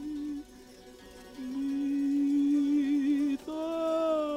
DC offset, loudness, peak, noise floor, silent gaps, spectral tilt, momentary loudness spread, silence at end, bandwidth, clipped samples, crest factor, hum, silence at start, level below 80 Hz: under 0.1%; -30 LUFS; -20 dBFS; -51 dBFS; none; -5.5 dB/octave; 18 LU; 0 s; 11 kHz; under 0.1%; 10 dB; none; 0 s; -62 dBFS